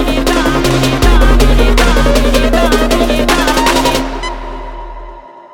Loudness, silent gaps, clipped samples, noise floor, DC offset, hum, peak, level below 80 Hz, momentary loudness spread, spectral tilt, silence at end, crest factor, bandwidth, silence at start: -11 LUFS; none; under 0.1%; -31 dBFS; under 0.1%; none; 0 dBFS; -14 dBFS; 16 LU; -4.5 dB/octave; 0.15 s; 10 dB; 17 kHz; 0 s